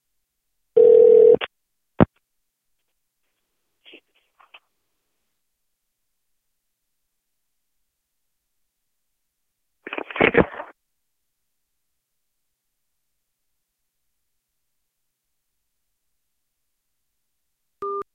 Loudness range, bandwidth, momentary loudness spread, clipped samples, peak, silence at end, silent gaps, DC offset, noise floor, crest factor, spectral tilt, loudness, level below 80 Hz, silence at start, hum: 17 LU; 3.8 kHz; 22 LU; under 0.1%; 0 dBFS; 0.15 s; none; under 0.1%; -79 dBFS; 24 dB; -9 dB/octave; -16 LUFS; -52 dBFS; 0.75 s; none